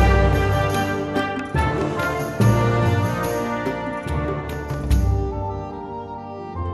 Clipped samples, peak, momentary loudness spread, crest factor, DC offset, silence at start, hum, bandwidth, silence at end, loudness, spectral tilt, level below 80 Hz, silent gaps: under 0.1%; -4 dBFS; 13 LU; 16 dB; under 0.1%; 0 s; none; 12.5 kHz; 0 s; -22 LUFS; -6.5 dB/octave; -28 dBFS; none